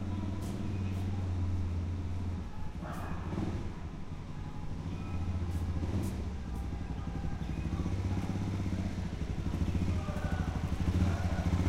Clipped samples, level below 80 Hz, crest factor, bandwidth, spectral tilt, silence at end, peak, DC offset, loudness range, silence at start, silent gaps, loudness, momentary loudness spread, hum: under 0.1%; -40 dBFS; 16 dB; 12 kHz; -7.5 dB/octave; 0 s; -18 dBFS; under 0.1%; 5 LU; 0 s; none; -36 LUFS; 8 LU; none